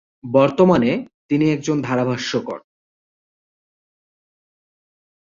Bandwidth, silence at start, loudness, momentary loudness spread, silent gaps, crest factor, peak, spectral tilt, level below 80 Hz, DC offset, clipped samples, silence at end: 7.6 kHz; 0.25 s; -18 LUFS; 11 LU; 1.14-1.29 s; 18 dB; -2 dBFS; -6.5 dB/octave; -58 dBFS; under 0.1%; under 0.1%; 2.6 s